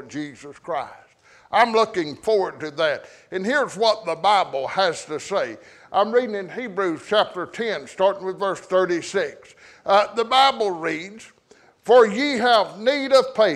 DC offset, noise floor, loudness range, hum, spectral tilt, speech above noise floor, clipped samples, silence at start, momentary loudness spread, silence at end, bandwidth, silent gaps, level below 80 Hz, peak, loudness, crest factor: under 0.1%; -55 dBFS; 4 LU; none; -3.5 dB/octave; 34 dB; under 0.1%; 0 s; 14 LU; 0 s; 12 kHz; none; -66 dBFS; -4 dBFS; -21 LUFS; 18 dB